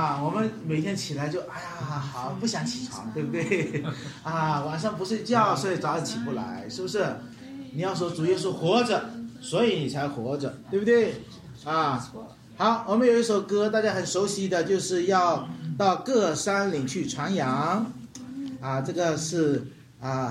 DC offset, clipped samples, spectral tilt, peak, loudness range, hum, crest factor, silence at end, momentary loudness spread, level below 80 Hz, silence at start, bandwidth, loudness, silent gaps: under 0.1%; under 0.1%; -5 dB/octave; -8 dBFS; 5 LU; none; 18 dB; 0 s; 12 LU; -64 dBFS; 0 s; 15.5 kHz; -27 LUFS; none